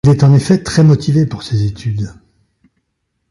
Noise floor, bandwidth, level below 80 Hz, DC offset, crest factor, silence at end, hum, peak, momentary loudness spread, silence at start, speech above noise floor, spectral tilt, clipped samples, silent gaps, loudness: -69 dBFS; 11.5 kHz; -40 dBFS; under 0.1%; 12 dB; 1.25 s; none; 0 dBFS; 11 LU; 0.05 s; 58 dB; -7.5 dB/octave; under 0.1%; none; -13 LUFS